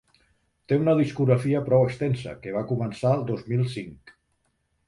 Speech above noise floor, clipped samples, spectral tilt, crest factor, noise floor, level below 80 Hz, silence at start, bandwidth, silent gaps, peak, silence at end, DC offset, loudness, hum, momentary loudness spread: 48 dB; under 0.1%; -8.5 dB/octave; 18 dB; -72 dBFS; -58 dBFS; 0.7 s; 11.5 kHz; none; -8 dBFS; 0.75 s; under 0.1%; -25 LUFS; none; 10 LU